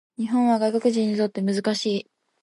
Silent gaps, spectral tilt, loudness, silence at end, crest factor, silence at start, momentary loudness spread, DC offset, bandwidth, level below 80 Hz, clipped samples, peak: none; -5.5 dB/octave; -23 LUFS; 0.4 s; 14 dB; 0.2 s; 5 LU; under 0.1%; 11.5 kHz; -74 dBFS; under 0.1%; -8 dBFS